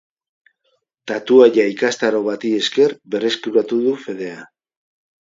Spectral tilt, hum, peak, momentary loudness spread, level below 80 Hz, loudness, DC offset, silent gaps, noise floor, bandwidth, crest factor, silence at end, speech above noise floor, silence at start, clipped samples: -4 dB/octave; none; 0 dBFS; 16 LU; -70 dBFS; -17 LUFS; under 0.1%; none; -67 dBFS; 7.8 kHz; 18 dB; 0.75 s; 51 dB; 1.05 s; under 0.1%